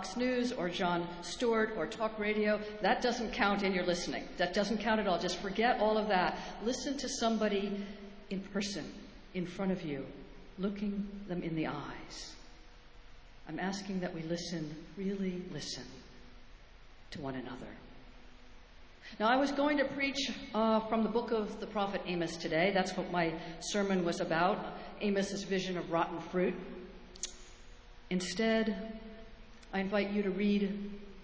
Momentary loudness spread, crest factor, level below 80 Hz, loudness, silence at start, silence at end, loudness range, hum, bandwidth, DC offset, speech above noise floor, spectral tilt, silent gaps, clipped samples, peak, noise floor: 15 LU; 20 dB; -58 dBFS; -34 LUFS; 0 s; 0 s; 9 LU; none; 8 kHz; under 0.1%; 20 dB; -5 dB/octave; none; under 0.1%; -14 dBFS; -54 dBFS